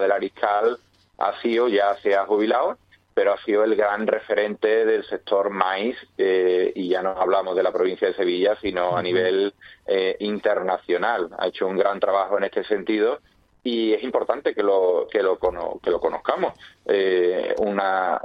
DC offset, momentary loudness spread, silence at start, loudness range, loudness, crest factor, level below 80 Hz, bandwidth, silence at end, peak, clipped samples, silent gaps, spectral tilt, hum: under 0.1%; 6 LU; 0 s; 2 LU; -22 LUFS; 20 dB; -60 dBFS; 5.8 kHz; 0 s; -2 dBFS; under 0.1%; none; -7 dB/octave; none